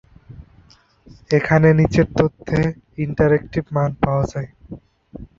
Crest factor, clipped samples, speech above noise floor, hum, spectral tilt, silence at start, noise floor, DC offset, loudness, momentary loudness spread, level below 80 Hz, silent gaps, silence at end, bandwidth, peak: 18 dB; under 0.1%; 34 dB; none; -8 dB/octave; 0.3 s; -52 dBFS; under 0.1%; -18 LUFS; 17 LU; -40 dBFS; none; 0.15 s; 7.4 kHz; -2 dBFS